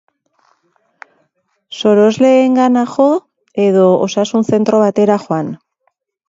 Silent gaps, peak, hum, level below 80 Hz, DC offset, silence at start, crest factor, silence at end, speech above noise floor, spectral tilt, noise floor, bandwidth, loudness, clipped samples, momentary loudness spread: none; 0 dBFS; none; -62 dBFS; under 0.1%; 1.7 s; 14 dB; 0.75 s; 54 dB; -6.5 dB/octave; -65 dBFS; 7.8 kHz; -12 LUFS; under 0.1%; 10 LU